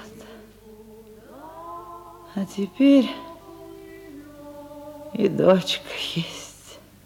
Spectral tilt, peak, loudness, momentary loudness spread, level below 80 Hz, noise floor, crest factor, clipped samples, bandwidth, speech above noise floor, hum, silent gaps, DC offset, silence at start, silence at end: -5.5 dB/octave; -4 dBFS; -22 LUFS; 25 LU; -60 dBFS; -47 dBFS; 22 dB; under 0.1%; 16.5 kHz; 26 dB; 50 Hz at -55 dBFS; none; under 0.1%; 0 s; 0.3 s